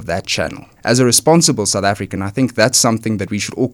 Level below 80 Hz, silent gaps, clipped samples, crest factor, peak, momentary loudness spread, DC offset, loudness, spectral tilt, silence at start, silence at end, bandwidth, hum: -48 dBFS; none; under 0.1%; 16 dB; 0 dBFS; 10 LU; under 0.1%; -15 LUFS; -3.5 dB/octave; 0 s; 0 s; 19 kHz; none